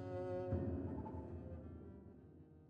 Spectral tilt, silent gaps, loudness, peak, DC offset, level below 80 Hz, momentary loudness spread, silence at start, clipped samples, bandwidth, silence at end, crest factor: -10.5 dB/octave; none; -46 LUFS; -30 dBFS; under 0.1%; -62 dBFS; 18 LU; 0 s; under 0.1%; 5.4 kHz; 0 s; 18 dB